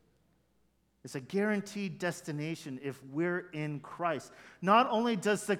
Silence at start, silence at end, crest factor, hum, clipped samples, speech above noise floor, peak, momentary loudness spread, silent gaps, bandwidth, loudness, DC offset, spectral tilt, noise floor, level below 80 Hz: 1.05 s; 0 s; 22 dB; none; under 0.1%; 40 dB; -12 dBFS; 14 LU; none; 16.5 kHz; -33 LUFS; under 0.1%; -5.5 dB/octave; -72 dBFS; -78 dBFS